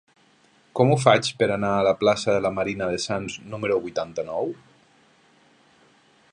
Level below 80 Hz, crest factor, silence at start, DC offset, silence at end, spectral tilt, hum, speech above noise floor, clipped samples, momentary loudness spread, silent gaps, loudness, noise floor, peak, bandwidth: -56 dBFS; 24 dB; 0.75 s; under 0.1%; 1.8 s; -5 dB/octave; none; 37 dB; under 0.1%; 11 LU; none; -23 LUFS; -59 dBFS; -2 dBFS; 11.5 kHz